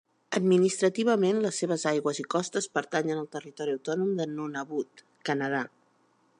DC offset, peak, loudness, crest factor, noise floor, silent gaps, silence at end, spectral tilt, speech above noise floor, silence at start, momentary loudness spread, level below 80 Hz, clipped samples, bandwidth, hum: under 0.1%; -12 dBFS; -28 LUFS; 18 dB; -67 dBFS; none; 0.7 s; -5 dB/octave; 39 dB; 0.3 s; 11 LU; -80 dBFS; under 0.1%; 11 kHz; none